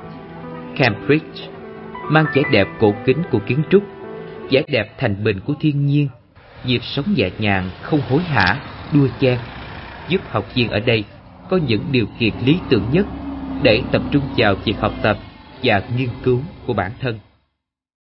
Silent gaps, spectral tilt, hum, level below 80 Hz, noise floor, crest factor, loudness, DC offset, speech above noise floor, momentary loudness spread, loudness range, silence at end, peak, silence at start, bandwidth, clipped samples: none; -10.5 dB/octave; none; -42 dBFS; -75 dBFS; 20 dB; -18 LUFS; under 0.1%; 57 dB; 17 LU; 2 LU; 0.9 s; 0 dBFS; 0 s; 5.8 kHz; under 0.1%